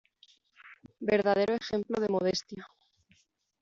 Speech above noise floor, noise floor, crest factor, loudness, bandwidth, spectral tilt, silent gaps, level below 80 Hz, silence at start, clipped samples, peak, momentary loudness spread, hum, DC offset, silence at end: 40 dB; -69 dBFS; 18 dB; -30 LUFS; 7.6 kHz; -4 dB/octave; none; -68 dBFS; 0.65 s; under 0.1%; -14 dBFS; 12 LU; none; under 0.1%; 0.95 s